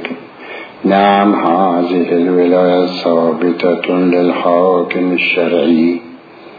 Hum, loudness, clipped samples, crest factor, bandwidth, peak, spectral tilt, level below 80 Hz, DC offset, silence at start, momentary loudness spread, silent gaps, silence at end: none; -12 LUFS; under 0.1%; 12 dB; 5 kHz; 0 dBFS; -8.5 dB/octave; -60 dBFS; under 0.1%; 0 s; 9 LU; none; 0 s